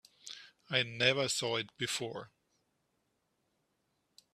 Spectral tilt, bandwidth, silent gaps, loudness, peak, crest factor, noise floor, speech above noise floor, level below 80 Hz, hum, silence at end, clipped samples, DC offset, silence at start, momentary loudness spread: -2.5 dB/octave; 14 kHz; none; -33 LUFS; -14 dBFS; 26 dB; -80 dBFS; 46 dB; -76 dBFS; none; 2.05 s; under 0.1%; under 0.1%; 0.25 s; 20 LU